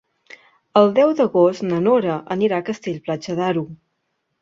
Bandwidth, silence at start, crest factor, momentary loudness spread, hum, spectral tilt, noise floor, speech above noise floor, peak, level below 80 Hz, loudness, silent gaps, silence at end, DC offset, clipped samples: 7.6 kHz; 0.75 s; 18 dB; 11 LU; none; -7 dB/octave; -73 dBFS; 55 dB; -2 dBFS; -64 dBFS; -19 LUFS; none; 0.65 s; under 0.1%; under 0.1%